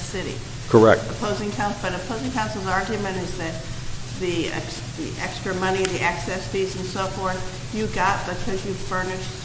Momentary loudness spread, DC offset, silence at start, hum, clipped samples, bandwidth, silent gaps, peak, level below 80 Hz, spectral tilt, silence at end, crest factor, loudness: 10 LU; under 0.1%; 0 s; none; under 0.1%; 8 kHz; none; -2 dBFS; -40 dBFS; -5 dB/octave; 0 s; 22 dB; -24 LUFS